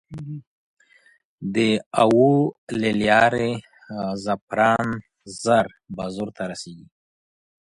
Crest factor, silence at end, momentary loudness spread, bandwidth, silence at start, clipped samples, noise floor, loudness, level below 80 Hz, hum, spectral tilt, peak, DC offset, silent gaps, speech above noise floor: 20 dB; 0.9 s; 18 LU; 11.5 kHz; 0.1 s; under 0.1%; -58 dBFS; -21 LUFS; -56 dBFS; none; -5.5 dB/octave; -2 dBFS; under 0.1%; 0.47-0.77 s, 1.24-1.38 s, 1.86-1.91 s, 2.58-2.67 s, 4.42-4.47 s; 37 dB